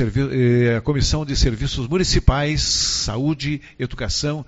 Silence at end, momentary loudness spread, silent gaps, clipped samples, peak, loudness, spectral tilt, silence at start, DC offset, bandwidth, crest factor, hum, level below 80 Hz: 0.05 s; 7 LU; none; under 0.1%; 0 dBFS; -20 LUFS; -4.5 dB/octave; 0 s; under 0.1%; 8.2 kHz; 18 dB; none; -26 dBFS